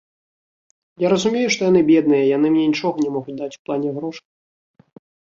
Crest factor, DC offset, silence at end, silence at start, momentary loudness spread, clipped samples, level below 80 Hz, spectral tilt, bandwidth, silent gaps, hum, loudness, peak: 16 dB; under 0.1%; 1.2 s; 1 s; 14 LU; under 0.1%; -62 dBFS; -5.5 dB/octave; 7.8 kHz; 3.59-3.65 s; none; -18 LUFS; -4 dBFS